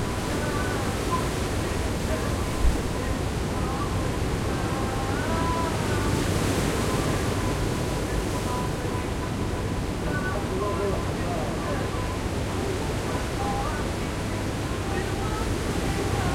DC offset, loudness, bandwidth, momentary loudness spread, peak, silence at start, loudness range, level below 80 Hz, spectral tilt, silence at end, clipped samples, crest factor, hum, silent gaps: 0.1%; -27 LUFS; 16.5 kHz; 4 LU; -10 dBFS; 0 s; 2 LU; -34 dBFS; -5.5 dB/octave; 0 s; under 0.1%; 16 dB; none; none